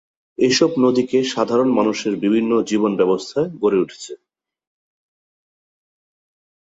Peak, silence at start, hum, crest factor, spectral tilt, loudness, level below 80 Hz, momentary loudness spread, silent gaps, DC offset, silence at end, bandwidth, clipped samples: -2 dBFS; 0.4 s; none; 18 dB; -5 dB/octave; -18 LUFS; -62 dBFS; 8 LU; none; under 0.1%; 2.5 s; 8 kHz; under 0.1%